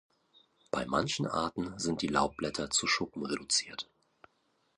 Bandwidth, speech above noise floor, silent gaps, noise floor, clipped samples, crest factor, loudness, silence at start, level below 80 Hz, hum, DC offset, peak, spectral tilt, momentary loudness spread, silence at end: 11 kHz; 42 dB; none; -74 dBFS; under 0.1%; 22 dB; -32 LUFS; 0.75 s; -60 dBFS; none; under 0.1%; -12 dBFS; -3 dB/octave; 8 LU; 0.95 s